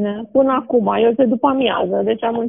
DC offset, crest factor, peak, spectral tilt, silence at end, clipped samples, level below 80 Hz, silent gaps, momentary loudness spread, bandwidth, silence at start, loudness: 0.1%; 14 dB; -2 dBFS; -4.5 dB/octave; 0 s; under 0.1%; -58 dBFS; none; 4 LU; 3.8 kHz; 0 s; -16 LUFS